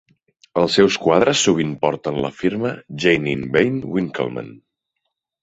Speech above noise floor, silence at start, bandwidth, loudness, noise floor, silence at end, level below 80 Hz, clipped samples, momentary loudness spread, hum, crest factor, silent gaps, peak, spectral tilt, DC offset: 59 dB; 0.55 s; 8.2 kHz; -19 LUFS; -77 dBFS; 0.85 s; -52 dBFS; under 0.1%; 11 LU; none; 18 dB; none; -2 dBFS; -4.5 dB/octave; under 0.1%